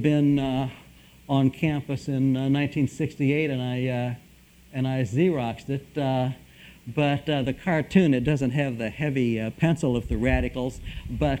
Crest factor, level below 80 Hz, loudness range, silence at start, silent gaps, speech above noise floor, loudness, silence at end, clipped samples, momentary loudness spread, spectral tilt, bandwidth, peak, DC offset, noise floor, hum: 18 dB; -42 dBFS; 3 LU; 0 s; none; 29 dB; -25 LUFS; 0 s; under 0.1%; 10 LU; -7.5 dB/octave; 15 kHz; -6 dBFS; under 0.1%; -53 dBFS; none